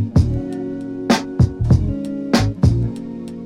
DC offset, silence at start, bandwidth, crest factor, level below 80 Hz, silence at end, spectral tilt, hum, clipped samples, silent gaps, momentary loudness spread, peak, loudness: under 0.1%; 0 s; 13.5 kHz; 16 dB; -28 dBFS; 0 s; -7 dB/octave; none; under 0.1%; none; 10 LU; -2 dBFS; -19 LUFS